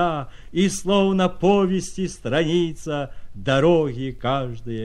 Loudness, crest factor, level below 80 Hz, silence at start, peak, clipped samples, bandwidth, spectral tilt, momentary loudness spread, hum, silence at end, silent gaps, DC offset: -22 LUFS; 16 dB; -42 dBFS; 0 s; -6 dBFS; under 0.1%; 12.5 kHz; -5.5 dB/octave; 11 LU; none; 0 s; none; under 0.1%